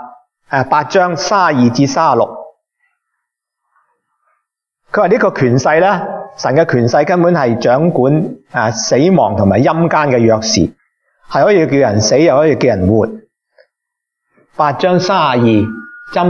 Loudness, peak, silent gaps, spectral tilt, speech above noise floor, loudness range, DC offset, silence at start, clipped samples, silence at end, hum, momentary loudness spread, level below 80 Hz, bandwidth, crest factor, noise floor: -12 LUFS; 0 dBFS; none; -5.5 dB/octave; 67 dB; 5 LU; under 0.1%; 0 s; under 0.1%; 0 s; none; 9 LU; -48 dBFS; 7.4 kHz; 12 dB; -78 dBFS